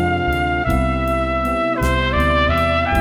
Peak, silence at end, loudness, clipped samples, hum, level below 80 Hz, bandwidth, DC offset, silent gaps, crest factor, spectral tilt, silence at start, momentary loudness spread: -4 dBFS; 0 s; -18 LUFS; under 0.1%; none; -24 dBFS; 16 kHz; under 0.1%; none; 14 dB; -6.5 dB/octave; 0 s; 3 LU